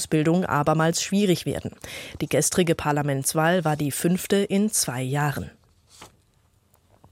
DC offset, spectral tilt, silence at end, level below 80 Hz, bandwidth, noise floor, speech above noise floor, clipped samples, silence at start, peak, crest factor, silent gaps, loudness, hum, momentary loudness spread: under 0.1%; -4.5 dB/octave; 1.05 s; -54 dBFS; 16.5 kHz; -63 dBFS; 40 dB; under 0.1%; 0 s; -8 dBFS; 16 dB; none; -23 LUFS; none; 11 LU